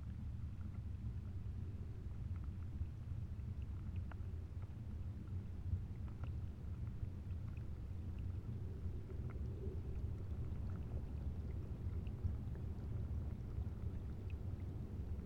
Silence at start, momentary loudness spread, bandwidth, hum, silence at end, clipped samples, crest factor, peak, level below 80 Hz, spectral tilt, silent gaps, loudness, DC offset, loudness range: 0 s; 3 LU; 6.4 kHz; none; 0 s; under 0.1%; 14 dB; -30 dBFS; -48 dBFS; -9.5 dB/octave; none; -47 LUFS; under 0.1%; 2 LU